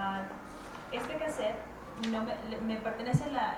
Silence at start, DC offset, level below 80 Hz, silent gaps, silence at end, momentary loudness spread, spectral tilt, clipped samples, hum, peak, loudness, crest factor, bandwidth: 0 s; under 0.1%; -56 dBFS; none; 0 s; 13 LU; -6 dB/octave; under 0.1%; none; -16 dBFS; -36 LUFS; 18 dB; 17 kHz